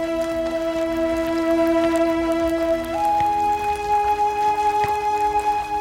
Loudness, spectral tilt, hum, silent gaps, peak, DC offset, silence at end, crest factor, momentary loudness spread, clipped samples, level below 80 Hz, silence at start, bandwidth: -21 LUFS; -5 dB/octave; none; none; -6 dBFS; under 0.1%; 0 s; 14 dB; 4 LU; under 0.1%; -44 dBFS; 0 s; 17 kHz